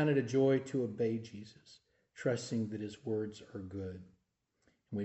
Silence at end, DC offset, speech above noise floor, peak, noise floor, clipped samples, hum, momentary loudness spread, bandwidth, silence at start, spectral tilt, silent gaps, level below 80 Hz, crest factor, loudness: 0 s; under 0.1%; 45 dB; -20 dBFS; -81 dBFS; under 0.1%; none; 18 LU; 8.2 kHz; 0 s; -7 dB/octave; none; -76 dBFS; 18 dB; -36 LUFS